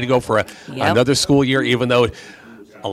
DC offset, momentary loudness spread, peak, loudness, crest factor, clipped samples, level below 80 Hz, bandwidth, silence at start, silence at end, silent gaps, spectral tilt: under 0.1%; 12 LU; -2 dBFS; -17 LUFS; 16 dB; under 0.1%; -46 dBFS; 15 kHz; 0 s; 0 s; none; -5 dB/octave